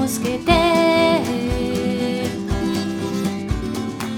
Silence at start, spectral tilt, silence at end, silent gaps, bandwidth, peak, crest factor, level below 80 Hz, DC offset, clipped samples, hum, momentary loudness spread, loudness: 0 s; -5 dB/octave; 0 s; none; 19.5 kHz; -2 dBFS; 16 dB; -34 dBFS; under 0.1%; under 0.1%; none; 9 LU; -20 LUFS